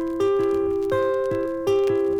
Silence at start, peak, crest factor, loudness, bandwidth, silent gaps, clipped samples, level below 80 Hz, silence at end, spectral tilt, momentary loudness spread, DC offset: 0 s; -10 dBFS; 12 dB; -22 LUFS; 10.5 kHz; none; under 0.1%; -52 dBFS; 0 s; -6.5 dB/octave; 3 LU; under 0.1%